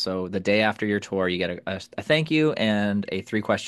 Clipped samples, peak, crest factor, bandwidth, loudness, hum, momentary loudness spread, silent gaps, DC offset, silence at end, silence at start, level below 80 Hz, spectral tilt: under 0.1%; -6 dBFS; 18 dB; 12 kHz; -24 LUFS; none; 7 LU; none; under 0.1%; 0 s; 0 s; -66 dBFS; -5.5 dB/octave